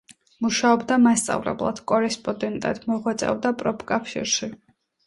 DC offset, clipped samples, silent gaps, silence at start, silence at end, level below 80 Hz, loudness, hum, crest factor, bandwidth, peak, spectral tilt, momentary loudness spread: under 0.1%; under 0.1%; none; 0.4 s; 0.5 s; -58 dBFS; -23 LUFS; none; 18 dB; 11.5 kHz; -6 dBFS; -3.5 dB/octave; 9 LU